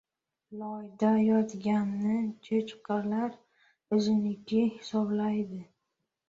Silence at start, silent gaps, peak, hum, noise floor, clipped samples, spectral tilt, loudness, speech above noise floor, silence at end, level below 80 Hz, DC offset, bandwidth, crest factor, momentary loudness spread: 0.5 s; none; -14 dBFS; none; -83 dBFS; under 0.1%; -7.5 dB/octave; -30 LUFS; 54 dB; 0.65 s; -72 dBFS; under 0.1%; 7.6 kHz; 16 dB; 13 LU